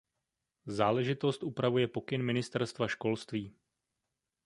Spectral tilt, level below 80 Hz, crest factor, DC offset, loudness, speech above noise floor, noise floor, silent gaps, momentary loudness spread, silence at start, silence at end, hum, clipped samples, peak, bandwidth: -6.5 dB/octave; -68 dBFS; 22 dB; under 0.1%; -33 LUFS; 55 dB; -87 dBFS; none; 10 LU; 0.65 s; 0.95 s; none; under 0.1%; -12 dBFS; 11.5 kHz